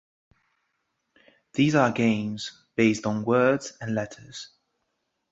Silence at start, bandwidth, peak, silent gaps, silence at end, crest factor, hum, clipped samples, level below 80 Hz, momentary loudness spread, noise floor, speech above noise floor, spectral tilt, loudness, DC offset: 1.55 s; 8 kHz; -6 dBFS; none; 0.85 s; 20 dB; none; under 0.1%; -64 dBFS; 18 LU; -78 dBFS; 53 dB; -6 dB/octave; -25 LUFS; under 0.1%